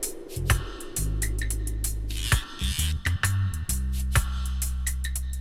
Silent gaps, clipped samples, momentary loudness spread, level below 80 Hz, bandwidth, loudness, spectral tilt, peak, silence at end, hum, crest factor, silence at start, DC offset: none; under 0.1%; 5 LU; -30 dBFS; 16.5 kHz; -28 LUFS; -3.5 dB/octave; -6 dBFS; 0 s; none; 20 dB; 0 s; under 0.1%